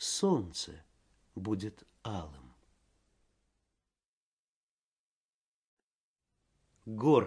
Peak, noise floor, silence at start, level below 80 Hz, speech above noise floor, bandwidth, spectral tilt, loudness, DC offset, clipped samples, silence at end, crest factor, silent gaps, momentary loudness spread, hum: -12 dBFS; under -90 dBFS; 0 s; -64 dBFS; over 58 dB; 10.5 kHz; -5 dB/octave; -35 LUFS; under 0.1%; under 0.1%; 0 s; 26 dB; 4.06-6.16 s; 20 LU; none